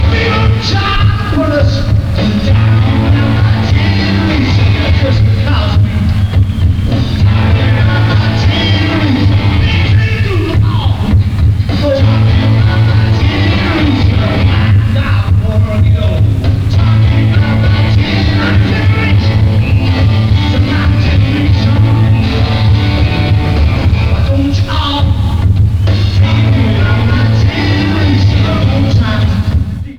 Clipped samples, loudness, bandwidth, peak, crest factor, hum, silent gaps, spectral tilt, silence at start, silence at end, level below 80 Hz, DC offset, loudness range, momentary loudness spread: under 0.1%; -10 LUFS; 7 kHz; 0 dBFS; 8 dB; none; none; -7.5 dB/octave; 0 s; 0 s; -18 dBFS; under 0.1%; 1 LU; 2 LU